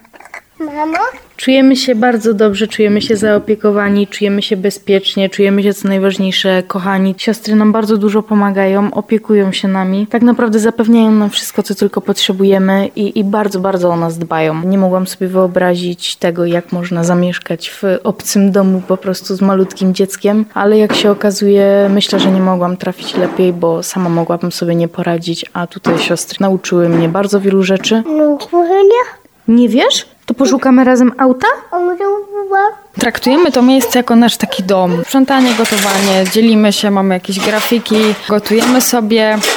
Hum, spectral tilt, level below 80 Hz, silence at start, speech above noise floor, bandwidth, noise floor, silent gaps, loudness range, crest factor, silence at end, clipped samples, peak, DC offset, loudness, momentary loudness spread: none; -5 dB/octave; -54 dBFS; 0.35 s; 23 dB; 19.5 kHz; -34 dBFS; none; 3 LU; 12 dB; 0 s; under 0.1%; 0 dBFS; under 0.1%; -12 LUFS; 7 LU